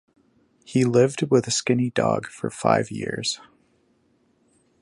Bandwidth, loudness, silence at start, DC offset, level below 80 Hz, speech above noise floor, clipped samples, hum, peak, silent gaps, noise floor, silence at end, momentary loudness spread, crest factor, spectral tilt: 11.5 kHz; -23 LUFS; 0.7 s; under 0.1%; -62 dBFS; 42 dB; under 0.1%; none; -4 dBFS; none; -64 dBFS; 1.45 s; 9 LU; 20 dB; -5 dB/octave